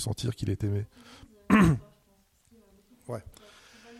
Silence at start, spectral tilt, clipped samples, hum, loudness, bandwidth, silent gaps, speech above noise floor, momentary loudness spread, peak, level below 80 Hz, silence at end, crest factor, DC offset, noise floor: 0 s; -6.5 dB/octave; under 0.1%; none; -27 LUFS; 15.5 kHz; none; 38 dB; 19 LU; -8 dBFS; -48 dBFS; 0.7 s; 22 dB; under 0.1%; -66 dBFS